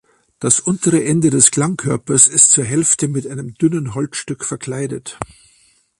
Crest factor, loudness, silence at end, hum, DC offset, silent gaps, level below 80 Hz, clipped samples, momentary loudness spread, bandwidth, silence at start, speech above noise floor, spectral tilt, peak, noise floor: 16 dB; -14 LUFS; 0.75 s; none; under 0.1%; none; -52 dBFS; under 0.1%; 15 LU; 13 kHz; 0.4 s; 39 dB; -4 dB/octave; 0 dBFS; -55 dBFS